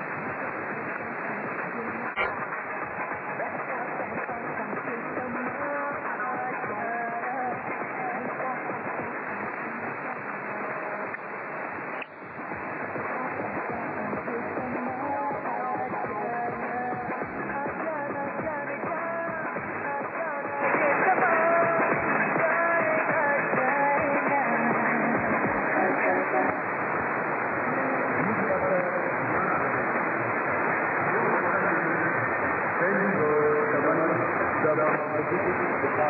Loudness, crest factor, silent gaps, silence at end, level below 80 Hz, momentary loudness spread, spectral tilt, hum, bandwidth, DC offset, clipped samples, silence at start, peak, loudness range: -27 LUFS; 14 dB; none; 0 s; -66 dBFS; 9 LU; -10.5 dB/octave; none; 4.9 kHz; under 0.1%; under 0.1%; 0 s; -12 dBFS; 8 LU